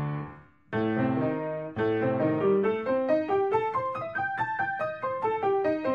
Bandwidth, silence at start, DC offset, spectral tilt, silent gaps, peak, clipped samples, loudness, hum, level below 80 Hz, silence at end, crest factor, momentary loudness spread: 6.8 kHz; 0 s; under 0.1%; -9 dB/octave; none; -14 dBFS; under 0.1%; -28 LUFS; none; -64 dBFS; 0 s; 14 dB; 7 LU